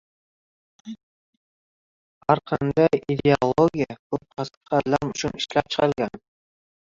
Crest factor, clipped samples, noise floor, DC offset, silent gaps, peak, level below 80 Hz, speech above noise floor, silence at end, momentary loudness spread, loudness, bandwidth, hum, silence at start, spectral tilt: 22 dB; under 0.1%; under -90 dBFS; under 0.1%; 1.03-2.21 s, 3.99-4.10 s, 4.57-4.61 s; -2 dBFS; -54 dBFS; over 68 dB; 0.7 s; 13 LU; -23 LUFS; 7.8 kHz; none; 0.85 s; -6 dB/octave